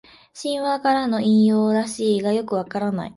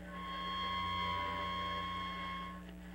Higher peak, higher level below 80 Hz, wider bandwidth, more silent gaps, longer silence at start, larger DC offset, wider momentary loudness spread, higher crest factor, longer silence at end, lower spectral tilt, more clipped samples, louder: first, -8 dBFS vs -28 dBFS; second, -62 dBFS vs -56 dBFS; second, 11.5 kHz vs 16 kHz; neither; first, 0.35 s vs 0 s; neither; about the same, 9 LU vs 7 LU; about the same, 12 dB vs 12 dB; about the same, 0.05 s vs 0 s; first, -6 dB/octave vs -4.5 dB/octave; neither; first, -20 LUFS vs -39 LUFS